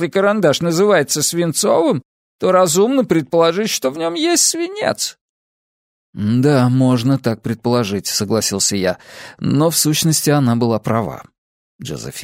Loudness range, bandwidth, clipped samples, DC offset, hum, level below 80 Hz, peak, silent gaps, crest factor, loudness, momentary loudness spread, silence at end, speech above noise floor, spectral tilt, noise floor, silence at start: 3 LU; 16 kHz; under 0.1%; under 0.1%; none; -56 dBFS; -2 dBFS; 2.05-2.39 s, 5.21-6.13 s, 11.38-11.79 s; 14 dB; -16 LUFS; 10 LU; 0 s; over 74 dB; -4.5 dB/octave; under -90 dBFS; 0 s